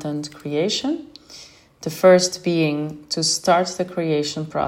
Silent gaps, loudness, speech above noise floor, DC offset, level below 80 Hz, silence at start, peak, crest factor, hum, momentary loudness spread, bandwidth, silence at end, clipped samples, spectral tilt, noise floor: none; -20 LUFS; 25 dB; under 0.1%; -60 dBFS; 0 s; -2 dBFS; 18 dB; none; 18 LU; 16 kHz; 0 s; under 0.1%; -4 dB/octave; -45 dBFS